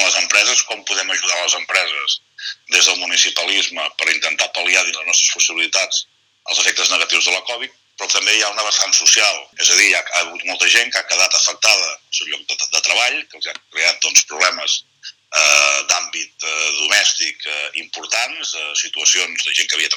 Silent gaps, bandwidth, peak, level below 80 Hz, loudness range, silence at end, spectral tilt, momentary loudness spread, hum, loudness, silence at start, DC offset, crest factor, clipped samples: none; over 20 kHz; 0 dBFS; -74 dBFS; 3 LU; 0 s; 3.5 dB/octave; 10 LU; none; -14 LUFS; 0 s; under 0.1%; 18 dB; under 0.1%